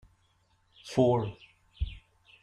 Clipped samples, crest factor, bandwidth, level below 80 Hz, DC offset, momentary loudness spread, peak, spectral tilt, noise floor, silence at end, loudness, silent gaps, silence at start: under 0.1%; 20 dB; 11.5 kHz; -46 dBFS; under 0.1%; 14 LU; -12 dBFS; -7.5 dB/octave; -69 dBFS; 0.45 s; -30 LUFS; none; 0.85 s